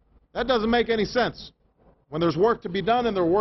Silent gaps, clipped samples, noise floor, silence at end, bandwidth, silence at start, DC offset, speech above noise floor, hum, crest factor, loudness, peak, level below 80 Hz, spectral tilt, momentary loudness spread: none; under 0.1%; -60 dBFS; 0 s; 6.2 kHz; 0.35 s; under 0.1%; 37 dB; none; 16 dB; -24 LUFS; -10 dBFS; -48 dBFS; -6.5 dB/octave; 11 LU